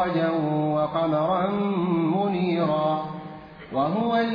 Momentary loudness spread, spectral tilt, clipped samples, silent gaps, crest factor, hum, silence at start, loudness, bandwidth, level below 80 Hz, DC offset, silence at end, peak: 9 LU; -9.5 dB/octave; under 0.1%; none; 12 dB; none; 0 s; -24 LUFS; 5.2 kHz; -58 dBFS; under 0.1%; 0 s; -12 dBFS